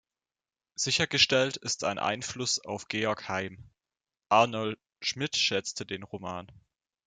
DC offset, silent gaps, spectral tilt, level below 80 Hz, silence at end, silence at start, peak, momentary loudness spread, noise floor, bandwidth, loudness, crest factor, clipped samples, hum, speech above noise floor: under 0.1%; none; -2.5 dB/octave; -68 dBFS; 0.55 s; 0.8 s; -8 dBFS; 15 LU; under -90 dBFS; 11 kHz; -28 LUFS; 24 dB; under 0.1%; none; over 60 dB